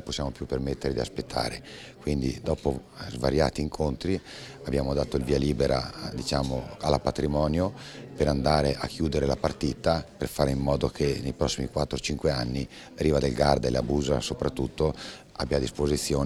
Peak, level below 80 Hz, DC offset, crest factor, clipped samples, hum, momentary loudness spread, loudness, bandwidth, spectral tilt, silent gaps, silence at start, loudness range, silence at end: -6 dBFS; -40 dBFS; under 0.1%; 22 dB; under 0.1%; none; 8 LU; -28 LUFS; 15 kHz; -5.5 dB/octave; none; 0 s; 3 LU; 0 s